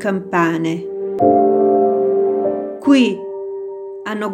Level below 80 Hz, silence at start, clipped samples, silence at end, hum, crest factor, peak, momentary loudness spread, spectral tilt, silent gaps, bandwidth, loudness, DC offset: -64 dBFS; 0 s; under 0.1%; 0 s; none; 16 dB; 0 dBFS; 14 LU; -6.5 dB/octave; none; 9.4 kHz; -16 LUFS; under 0.1%